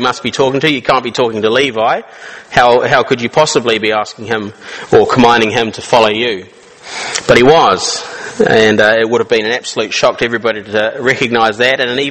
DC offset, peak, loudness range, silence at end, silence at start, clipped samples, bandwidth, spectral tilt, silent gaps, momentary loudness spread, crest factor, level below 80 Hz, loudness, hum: under 0.1%; 0 dBFS; 2 LU; 0 s; 0 s; 0.5%; 10.5 kHz; -3.5 dB/octave; none; 11 LU; 12 dB; -44 dBFS; -11 LUFS; none